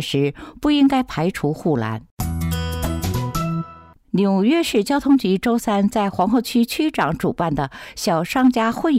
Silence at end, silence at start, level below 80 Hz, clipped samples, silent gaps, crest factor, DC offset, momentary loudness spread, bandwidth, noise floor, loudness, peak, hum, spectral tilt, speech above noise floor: 0 s; 0 s; -40 dBFS; under 0.1%; 2.11-2.17 s; 12 dB; under 0.1%; 9 LU; 16 kHz; -43 dBFS; -20 LUFS; -8 dBFS; none; -6 dB/octave; 24 dB